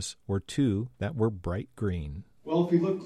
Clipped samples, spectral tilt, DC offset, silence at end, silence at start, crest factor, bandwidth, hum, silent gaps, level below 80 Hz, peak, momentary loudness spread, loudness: under 0.1%; -7 dB/octave; under 0.1%; 0 s; 0 s; 18 dB; 12.5 kHz; none; none; -48 dBFS; -12 dBFS; 10 LU; -30 LUFS